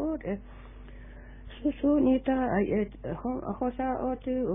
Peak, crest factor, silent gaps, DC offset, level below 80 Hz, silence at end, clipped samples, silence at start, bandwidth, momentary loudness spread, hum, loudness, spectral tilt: -14 dBFS; 14 dB; none; under 0.1%; -46 dBFS; 0 s; under 0.1%; 0 s; 3.8 kHz; 24 LU; none; -29 LUFS; -11 dB/octave